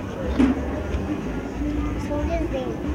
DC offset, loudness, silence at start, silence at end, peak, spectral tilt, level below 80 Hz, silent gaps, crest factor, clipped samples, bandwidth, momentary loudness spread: under 0.1%; -25 LUFS; 0 s; 0 s; -8 dBFS; -7.5 dB/octave; -32 dBFS; none; 18 dB; under 0.1%; 13.5 kHz; 7 LU